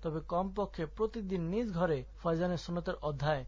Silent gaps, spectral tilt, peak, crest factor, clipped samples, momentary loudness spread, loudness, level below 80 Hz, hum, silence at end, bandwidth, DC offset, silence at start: none; -7.5 dB/octave; -20 dBFS; 14 dB; under 0.1%; 4 LU; -35 LUFS; -50 dBFS; none; 0 s; 7.6 kHz; under 0.1%; 0 s